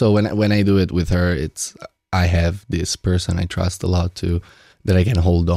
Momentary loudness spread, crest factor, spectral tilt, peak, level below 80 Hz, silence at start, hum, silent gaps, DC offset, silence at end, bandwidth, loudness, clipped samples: 8 LU; 12 dB; -6 dB/octave; -6 dBFS; -36 dBFS; 0 s; none; none; under 0.1%; 0 s; 13.5 kHz; -19 LUFS; under 0.1%